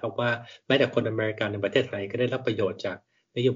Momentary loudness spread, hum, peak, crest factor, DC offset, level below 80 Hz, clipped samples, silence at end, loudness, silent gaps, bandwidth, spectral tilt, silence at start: 11 LU; none; -8 dBFS; 18 dB; under 0.1%; -68 dBFS; under 0.1%; 0 s; -27 LUFS; none; 7.4 kHz; -4 dB/octave; 0 s